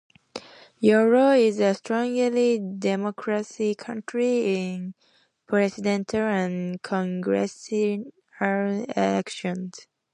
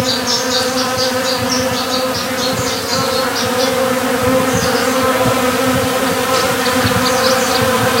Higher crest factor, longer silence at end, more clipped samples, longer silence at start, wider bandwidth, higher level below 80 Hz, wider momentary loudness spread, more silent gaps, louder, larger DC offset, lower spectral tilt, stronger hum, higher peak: about the same, 18 dB vs 14 dB; first, 0.3 s vs 0 s; neither; first, 0.35 s vs 0 s; second, 10.5 kHz vs 16 kHz; second, -68 dBFS vs -42 dBFS; first, 14 LU vs 3 LU; neither; second, -24 LUFS vs -14 LUFS; neither; first, -6 dB/octave vs -3 dB/octave; neither; second, -6 dBFS vs 0 dBFS